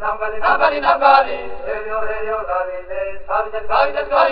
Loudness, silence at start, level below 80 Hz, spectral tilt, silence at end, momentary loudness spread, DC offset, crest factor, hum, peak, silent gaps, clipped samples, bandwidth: -18 LUFS; 0 s; -40 dBFS; 0 dB/octave; 0 s; 13 LU; under 0.1%; 18 dB; none; 0 dBFS; none; under 0.1%; 5.4 kHz